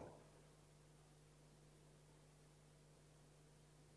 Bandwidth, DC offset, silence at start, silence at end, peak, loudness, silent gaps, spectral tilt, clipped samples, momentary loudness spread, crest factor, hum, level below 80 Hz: 11 kHz; under 0.1%; 0 s; 0 s; -44 dBFS; -68 LUFS; none; -5 dB/octave; under 0.1%; 2 LU; 22 dB; 50 Hz at -70 dBFS; -78 dBFS